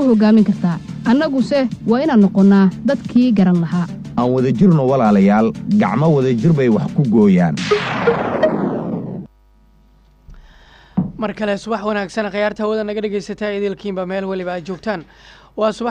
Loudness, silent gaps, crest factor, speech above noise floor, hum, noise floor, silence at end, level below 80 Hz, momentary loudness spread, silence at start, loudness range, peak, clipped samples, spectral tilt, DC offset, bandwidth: -16 LUFS; none; 12 dB; 36 dB; none; -50 dBFS; 0 s; -48 dBFS; 11 LU; 0 s; 9 LU; -4 dBFS; under 0.1%; -8 dB/octave; under 0.1%; 8.8 kHz